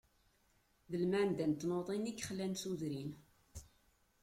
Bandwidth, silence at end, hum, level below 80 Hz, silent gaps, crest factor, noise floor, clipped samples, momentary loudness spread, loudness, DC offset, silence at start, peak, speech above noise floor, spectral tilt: 16 kHz; 0.55 s; none; -68 dBFS; none; 16 dB; -75 dBFS; under 0.1%; 22 LU; -39 LUFS; under 0.1%; 0.9 s; -24 dBFS; 36 dB; -5.5 dB/octave